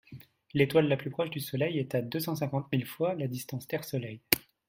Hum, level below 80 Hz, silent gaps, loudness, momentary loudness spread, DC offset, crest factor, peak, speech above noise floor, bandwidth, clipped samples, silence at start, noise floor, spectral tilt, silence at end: none; -66 dBFS; none; -31 LUFS; 10 LU; under 0.1%; 30 dB; -2 dBFS; 21 dB; 16.5 kHz; under 0.1%; 0.1 s; -52 dBFS; -5.5 dB/octave; 0.3 s